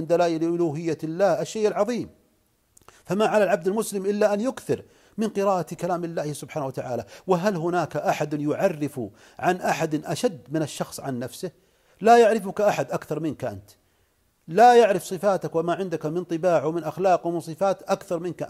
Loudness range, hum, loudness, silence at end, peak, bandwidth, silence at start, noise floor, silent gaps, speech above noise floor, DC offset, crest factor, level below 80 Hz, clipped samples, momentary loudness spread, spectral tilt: 5 LU; none; -24 LUFS; 0 s; -4 dBFS; 15.5 kHz; 0 s; -66 dBFS; none; 43 dB; under 0.1%; 20 dB; -66 dBFS; under 0.1%; 13 LU; -5.5 dB/octave